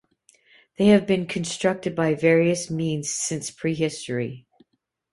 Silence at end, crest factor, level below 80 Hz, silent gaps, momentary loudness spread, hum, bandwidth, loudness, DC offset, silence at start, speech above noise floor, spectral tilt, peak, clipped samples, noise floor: 0.75 s; 20 dB; -60 dBFS; none; 10 LU; none; 11.5 kHz; -23 LUFS; under 0.1%; 0.8 s; 50 dB; -5 dB/octave; -4 dBFS; under 0.1%; -72 dBFS